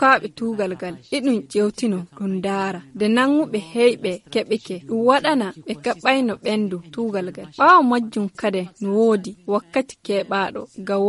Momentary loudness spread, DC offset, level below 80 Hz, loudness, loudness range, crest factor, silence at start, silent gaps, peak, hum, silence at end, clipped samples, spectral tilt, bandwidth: 10 LU; under 0.1%; -64 dBFS; -21 LUFS; 3 LU; 18 dB; 0 s; none; -2 dBFS; none; 0 s; under 0.1%; -5.5 dB/octave; 11.5 kHz